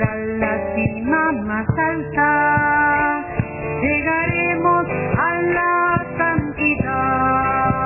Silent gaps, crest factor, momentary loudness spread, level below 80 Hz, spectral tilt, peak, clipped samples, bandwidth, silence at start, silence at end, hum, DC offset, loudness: none; 16 dB; 6 LU; -38 dBFS; -11 dB/octave; -4 dBFS; under 0.1%; 3 kHz; 0 s; 0 s; none; under 0.1%; -18 LUFS